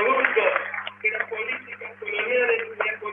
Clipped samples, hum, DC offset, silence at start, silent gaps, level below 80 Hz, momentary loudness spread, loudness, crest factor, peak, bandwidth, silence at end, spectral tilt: under 0.1%; 50 Hz at -55 dBFS; under 0.1%; 0 s; none; -82 dBFS; 11 LU; -24 LUFS; 24 dB; -2 dBFS; 3.8 kHz; 0 s; -5.5 dB/octave